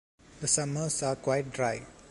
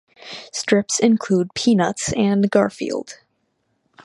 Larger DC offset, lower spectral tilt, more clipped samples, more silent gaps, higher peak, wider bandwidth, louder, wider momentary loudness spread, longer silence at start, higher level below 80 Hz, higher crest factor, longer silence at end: neither; about the same, -3.5 dB/octave vs -4.5 dB/octave; neither; neither; second, -12 dBFS vs -2 dBFS; about the same, 11.5 kHz vs 11.5 kHz; second, -30 LUFS vs -19 LUFS; second, 6 LU vs 13 LU; about the same, 0.3 s vs 0.25 s; second, -60 dBFS vs -54 dBFS; about the same, 20 dB vs 18 dB; about the same, 0 s vs 0.05 s